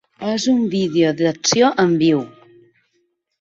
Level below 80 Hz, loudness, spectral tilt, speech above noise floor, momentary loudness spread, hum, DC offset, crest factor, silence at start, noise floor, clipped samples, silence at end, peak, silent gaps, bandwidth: -60 dBFS; -17 LUFS; -4.5 dB/octave; 51 dB; 7 LU; none; under 0.1%; 16 dB; 0.2 s; -67 dBFS; under 0.1%; 1.1 s; -2 dBFS; none; 7.8 kHz